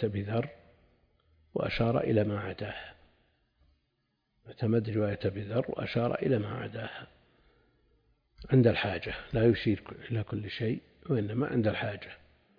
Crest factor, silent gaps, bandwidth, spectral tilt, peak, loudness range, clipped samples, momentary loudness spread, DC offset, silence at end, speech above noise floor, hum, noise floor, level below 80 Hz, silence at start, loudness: 22 dB; none; 5.2 kHz; -9.5 dB/octave; -10 dBFS; 5 LU; under 0.1%; 14 LU; under 0.1%; 0.4 s; 48 dB; none; -78 dBFS; -56 dBFS; 0 s; -31 LUFS